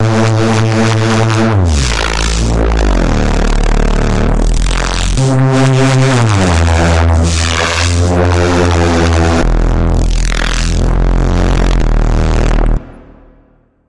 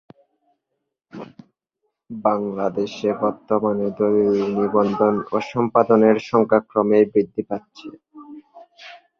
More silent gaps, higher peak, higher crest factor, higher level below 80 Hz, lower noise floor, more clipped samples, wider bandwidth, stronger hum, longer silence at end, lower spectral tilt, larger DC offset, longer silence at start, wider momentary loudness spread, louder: neither; about the same, 0 dBFS vs -2 dBFS; second, 10 dB vs 20 dB; first, -14 dBFS vs -62 dBFS; second, -48 dBFS vs -78 dBFS; neither; first, 11.5 kHz vs 6.8 kHz; neither; second, 0 s vs 0.25 s; second, -5.5 dB/octave vs -8 dB/octave; first, 3% vs under 0.1%; second, 0 s vs 1.15 s; second, 5 LU vs 22 LU; first, -12 LUFS vs -20 LUFS